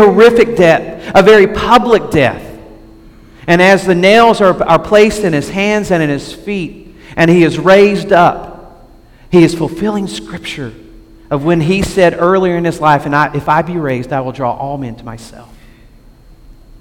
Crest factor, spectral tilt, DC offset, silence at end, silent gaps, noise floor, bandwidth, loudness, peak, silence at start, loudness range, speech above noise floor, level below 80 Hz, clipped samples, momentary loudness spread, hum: 12 dB; -6 dB/octave; under 0.1%; 1.4 s; none; -40 dBFS; 17 kHz; -10 LUFS; 0 dBFS; 0 s; 6 LU; 30 dB; -36 dBFS; 0.6%; 16 LU; none